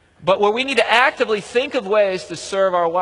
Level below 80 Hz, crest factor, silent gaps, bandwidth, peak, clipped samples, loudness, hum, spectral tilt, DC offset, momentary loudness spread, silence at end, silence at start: -58 dBFS; 18 dB; none; 11 kHz; 0 dBFS; under 0.1%; -18 LUFS; none; -3.5 dB/octave; under 0.1%; 6 LU; 0 s; 0.2 s